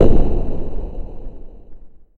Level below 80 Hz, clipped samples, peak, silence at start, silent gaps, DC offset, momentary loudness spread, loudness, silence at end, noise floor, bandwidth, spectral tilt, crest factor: -20 dBFS; under 0.1%; 0 dBFS; 0 s; none; under 0.1%; 23 LU; -24 LUFS; 0.15 s; -35 dBFS; 3 kHz; -10 dB/octave; 14 dB